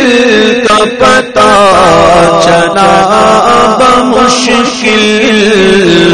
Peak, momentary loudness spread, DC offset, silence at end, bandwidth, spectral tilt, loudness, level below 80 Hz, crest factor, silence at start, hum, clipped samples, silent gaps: 0 dBFS; 3 LU; under 0.1%; 0 s; 12 kHz; -4 dB/octave; -5 LUFS; -32 dBFS; 4 dB; 0 s; none; 5%; none